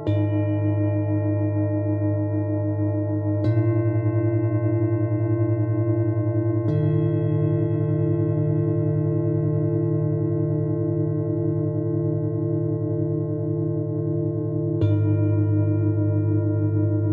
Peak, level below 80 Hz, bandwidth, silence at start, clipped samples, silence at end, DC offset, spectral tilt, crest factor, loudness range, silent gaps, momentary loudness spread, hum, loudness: -10 dBFS; -58 dBFS; 3.7 kHz; 0 s; under 0.1%; 0 s; under 0.1%; -13 dB/octave; 12 dB; 2 LU; none; 3 LU; none; -23 LUFS